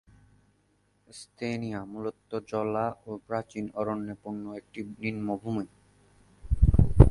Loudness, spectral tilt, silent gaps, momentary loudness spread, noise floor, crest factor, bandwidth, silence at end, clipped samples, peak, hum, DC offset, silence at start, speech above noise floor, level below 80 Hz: -31 LUFS; -8.5 dB/octave; none; 17 LU; -69 dBFS; 28 dB; 11.5 kHz; 0 s; under 0.1%; 0 dBFS; none; under 0.1%; 1.15 s; 35 dB; -32 dBFS